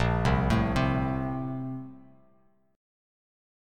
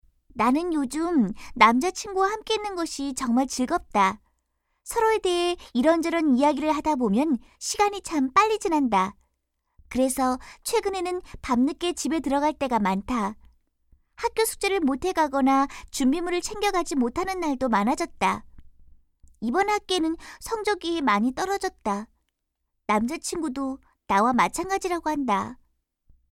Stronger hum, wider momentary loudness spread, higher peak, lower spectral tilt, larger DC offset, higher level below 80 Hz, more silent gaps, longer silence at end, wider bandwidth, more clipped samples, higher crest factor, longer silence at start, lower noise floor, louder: neither; first, 13 LU vs 9 LU; second, -12 dBFS vs -2 dBFS; first, -7.5 dB/octave vs -4 dB/octave; neither; first, -38 dBFS vs -50 dBFS; neither; first, 1.75 s vs 0.8 s; second, 11 kHz vs 16.5 kHz; neither; second, 18 dB vs 24 dB; second, 0 s vs 0.35 s; second, -66 dBFS vs -79 dBFS; second, -28 LUFS vs -25 LUFS